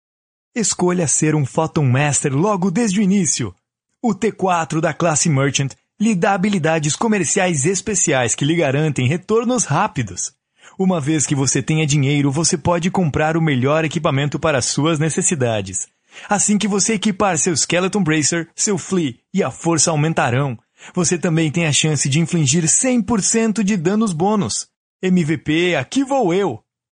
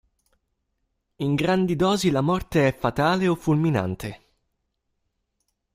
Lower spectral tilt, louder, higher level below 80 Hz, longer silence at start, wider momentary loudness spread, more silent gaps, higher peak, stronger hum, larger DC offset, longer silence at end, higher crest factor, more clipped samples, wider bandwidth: second, -4.5 dB/octave vs -6.5 dB/octave; first, -17 LUFS vs -23 LUFS; about the same, -50 dBFS vs -50 dBFS; second, 0.55 s vs 1.2 s; second, 6 LU vs 9 LU; first, 24.76-25.00 s vs none; first, 0 dBFS vs -6 dBFS; neither; neither; second, 0.35 s vs 1.6 s; about the same, 16 dB vs 18 dB; neither; second, 10 kHz vs 16 kHz